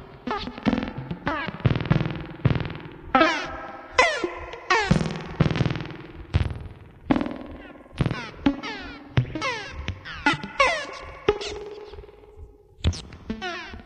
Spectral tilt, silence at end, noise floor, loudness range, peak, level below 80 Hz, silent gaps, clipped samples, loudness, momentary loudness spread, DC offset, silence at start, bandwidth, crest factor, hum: -5.5 dB/octave; 0 s; -46 dBFS; 5 LU; -4 dBFS; -40 dBFS; none; under 0.1%; -26 LUFS; 17 LU; under 0.1%; 0 s; 10.5 kHz; 24 dB; none